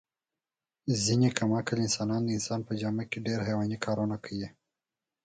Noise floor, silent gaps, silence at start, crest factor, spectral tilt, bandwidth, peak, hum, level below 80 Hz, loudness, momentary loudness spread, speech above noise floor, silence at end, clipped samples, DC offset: under -90 dBFS; none; 0.85 s; 24 dB; -5 dB/octave; 9.4 kHz; -8 dBFS; none; -62 dBFS; -30 LUFS; 11 LU; over 60 dB; 0.75 s; under 0.1%; under 0.1%